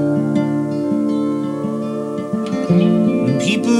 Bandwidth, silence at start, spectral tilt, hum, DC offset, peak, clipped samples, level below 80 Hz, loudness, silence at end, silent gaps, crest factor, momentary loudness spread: 11.5 kHz; 0 s; -7 dB/octave; none; under 0.1%; -4 dBFS; under 0.1%; -62 dBFS; -18 LUFS; 0 s; none; 14 dB; 8 LU